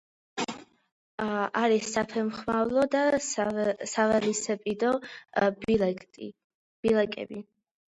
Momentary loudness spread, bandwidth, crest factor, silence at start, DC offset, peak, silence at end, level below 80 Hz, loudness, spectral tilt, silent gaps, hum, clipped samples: 15 LU; 11 kHz; 18 dB; 0.35 s; under 0.1%; -12 dBFS; 0.5 s; -62 dBFS; -28 LUFS; -4 dB/octave; 0.92-1.18 s, 6.44-6.83 s; none; under 0.1%